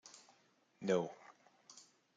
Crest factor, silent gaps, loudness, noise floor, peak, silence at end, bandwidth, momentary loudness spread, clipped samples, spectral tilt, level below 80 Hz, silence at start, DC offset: 22 dB; none; -39 LUFS; -73 dBFS; -22 dBFS; 0.35 s; 9.2 kHz; 23 LU; under 0.1%; -5.5 dB/octave; under -90 dBFS; 0.05 s; under 0.1%